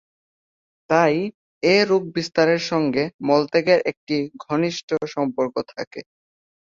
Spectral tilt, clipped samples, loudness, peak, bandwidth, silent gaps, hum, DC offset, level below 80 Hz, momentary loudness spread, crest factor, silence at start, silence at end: -5.5 dB/octave; under 0.1%; -21 LUFS; -2 dBFS; 7.6 kHz; 1.34-1.61 s, 3.14-3.19 s, 3.97-4.07 s, 4.83-4.88 s, 5.87-5.91 s; none; under 0.1%; -64 dBFS; 10 LU; 20 dB; 0.9 s; 0.65 s